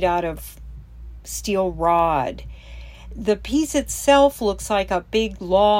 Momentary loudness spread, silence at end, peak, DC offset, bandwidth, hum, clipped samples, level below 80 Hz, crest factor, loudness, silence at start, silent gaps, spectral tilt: 23 LU; 0 s; -4 dBFS; under 0.1%; 16.5 kHz; none; under 0.1%; -38 dBFS; 18 dB; -21 LUFS; 0 s; none; -4 dB/octave